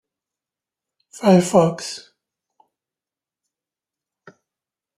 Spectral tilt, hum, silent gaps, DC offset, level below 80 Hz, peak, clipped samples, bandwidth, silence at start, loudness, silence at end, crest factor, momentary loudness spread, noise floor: -6 dB/octave; none; none; under 0.1%; -66 dBFS; -2 dBFS; under 0.1%; 14 kHz; 1.2 s; -17 LUFS; 3 s; 22 dB; 17 LU; -90 dBFS